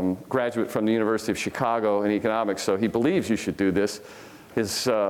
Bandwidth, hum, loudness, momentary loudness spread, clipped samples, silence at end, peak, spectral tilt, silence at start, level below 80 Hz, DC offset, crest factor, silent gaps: 18.5 kHz; none; -25 LUFS; 6 LU; under 0.1%; 0 s; -8 dBFS; -5 dB/octave; 0 s; -58 dBFS; under 0.1%; 16 dB; none